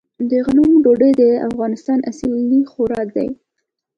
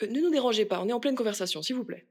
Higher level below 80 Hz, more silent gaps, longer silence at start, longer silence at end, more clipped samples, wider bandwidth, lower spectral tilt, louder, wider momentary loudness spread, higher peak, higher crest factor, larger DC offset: first, -48 dBFS vs -84 dBFS; neither; first, 0.2 s vs 0 s; first, 0.65 s vs 0.1 s; neither; second, 7.8 kHz vs 17 kHz; first, -7.5 dB/octave vs -4 dB/octave; first, -16 LUFS vs -28 LUFS; first, 10 LU vs 6 LU; first, -2 dBFS vs -14 dBFS; about the same, 14 dB vs 14 dB; neither